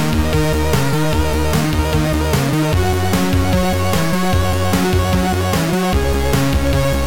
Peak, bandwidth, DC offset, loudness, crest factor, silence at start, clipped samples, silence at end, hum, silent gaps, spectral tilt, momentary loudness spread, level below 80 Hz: -4 dBFS; 17 kHz; 5%; -16 LUFS; 12 dB; 0 s; under 0.1%; 0 s; none; none; -5.5 dB/octave; 1 LU; -24 dBFS